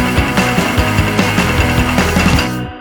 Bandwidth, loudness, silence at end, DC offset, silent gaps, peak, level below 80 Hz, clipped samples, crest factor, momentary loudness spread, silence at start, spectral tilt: over 20 kHz; -13 LUFS; 0 s; under 0.1%; none; 0 dBFS; -22 dBFS; under 0.1%; 12 dB; 1 LU; 0 s; -5 dB/octave